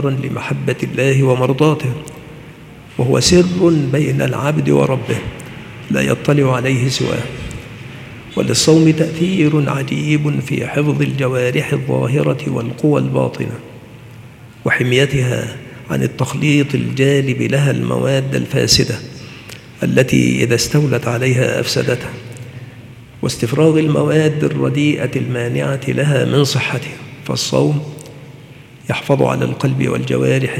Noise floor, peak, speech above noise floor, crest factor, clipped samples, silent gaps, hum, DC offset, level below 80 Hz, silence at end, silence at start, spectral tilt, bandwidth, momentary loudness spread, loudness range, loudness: -38 dBFS; 0 dBFS; 23 dB; 16 dB; under 0.1%; none; none; under 0.1%; -44 dBFS; 0 s; 0 s; -5.5 dB/octave; 15.5 kHz; 18 LU; 3 LU; -15 LUFS